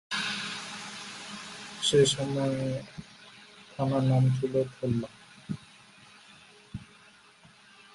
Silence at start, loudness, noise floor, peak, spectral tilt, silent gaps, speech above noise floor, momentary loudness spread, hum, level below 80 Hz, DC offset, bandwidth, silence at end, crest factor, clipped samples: 0.1 s; -29 LUFS; -57 dBFS; -12 dBFS; -5 dB/octave; none; 30 dB; 21 LU; none; -62 dBFS; under 0.1%; 11.5 kHz; 1.1 s; 20 dB; under 0.1%